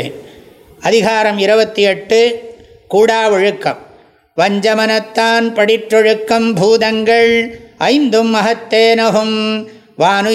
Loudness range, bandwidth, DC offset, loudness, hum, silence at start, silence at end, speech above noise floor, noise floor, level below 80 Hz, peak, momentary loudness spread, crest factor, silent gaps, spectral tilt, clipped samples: 2 LU; 14 kHz; under 0.1%; -12 LUFS; none; 0 s; 0 s; 29 dB; -40 dBFS; -56 dBFS; 0 dBFS; 9 LU; 12 dB; none; -4 dB/octave; under 0.1%